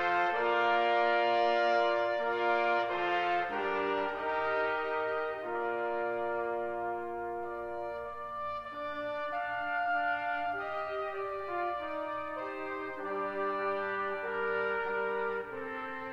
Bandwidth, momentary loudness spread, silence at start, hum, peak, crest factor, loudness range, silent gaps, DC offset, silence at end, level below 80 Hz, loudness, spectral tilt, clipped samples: 7.8 kHz; 10 LU; 0 s; none; -16 dBFS; 16 dB; 7 LU; none; under 0.1%; 0 s; -66 dBFS; -33 LUFS; -5 dB/octave; under 0.1%